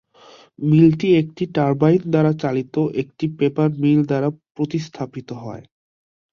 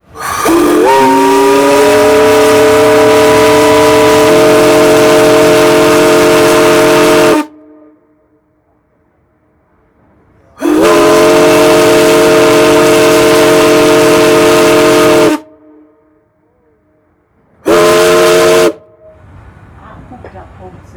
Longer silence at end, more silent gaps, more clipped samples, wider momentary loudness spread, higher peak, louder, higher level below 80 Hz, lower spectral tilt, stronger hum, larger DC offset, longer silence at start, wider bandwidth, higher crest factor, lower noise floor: first, 0.7 s vs 0.25 s; first, 4.51-4.55 s vs none; neither; first, 16 LU vs 4 LU; about the same, -2 dBFS vs 0 dBFS; second, -19 LUFS vs -6 LUFS; second, -58 dBFS vs -38 dBFS; first, -9 dB/octave vs -4 dB/octave; neither; neither; first, 0.6 s vs 0.15 s; second, 6.8 kHz vs over 20 kHz; first, 18 dB vs 8 dB; second, -48 dBFS vs -54 dBFS